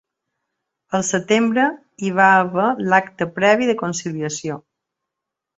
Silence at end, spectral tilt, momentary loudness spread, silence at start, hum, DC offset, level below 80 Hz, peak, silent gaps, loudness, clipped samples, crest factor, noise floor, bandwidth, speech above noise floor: 1 s; -4.5 dB/octave; 12 LU; 0.9 s; none; under 0.1%; -62 dBFS; -2 dBFS; none; -18 LUFS; under 0.1%; 18 dB; -83 dBFS; 8.2 kHz; 65 dB